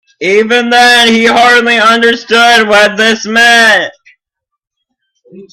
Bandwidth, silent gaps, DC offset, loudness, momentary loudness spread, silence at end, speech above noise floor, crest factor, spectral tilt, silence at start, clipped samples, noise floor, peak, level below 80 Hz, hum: 16.5 kHz; none; under 0.1%; -6 LUFS; 6 LU; 0.1 s; 68 dB; 8 dB; -2 dB/octave; 0.2 s; 0.6%; -75 dBFS; 0 dBFS; -50 dBFS; none